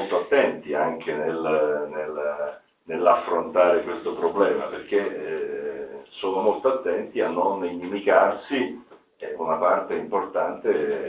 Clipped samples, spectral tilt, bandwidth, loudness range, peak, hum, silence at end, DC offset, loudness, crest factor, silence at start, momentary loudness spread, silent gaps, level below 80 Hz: under 0.1%; -9 dB/octave; 4 kHz; 2 LU; -4 dBFS; none; 0 s; under 0.1%; -24 LUFS; 20 dB; 0 s; 11 LU; none; -66 dBFS